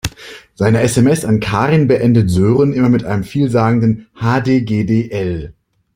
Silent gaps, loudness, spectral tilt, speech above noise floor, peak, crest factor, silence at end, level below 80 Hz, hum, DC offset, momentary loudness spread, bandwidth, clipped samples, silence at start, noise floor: none; -14 LUFS; -7 dB/octave; 23 dB; -2 dBFS; 12 dB; 0.45 s; -40 dBFS; none; under 0.1%; 9 LU; 16 kHz; under 0.1%; 0.05 s; -36 dBFS